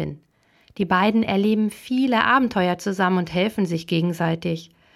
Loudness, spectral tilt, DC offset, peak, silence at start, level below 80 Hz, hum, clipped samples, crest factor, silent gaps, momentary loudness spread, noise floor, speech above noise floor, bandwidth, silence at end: -21 LUFS; -6.5 dB/octave; under 0.1%; -2 dBFS; 0 s; -58 dBFS; none; under 0.1%; 20 dB; none; 8 LU; -60 dBFS; 39 dB; 14 kHz; 0.3 s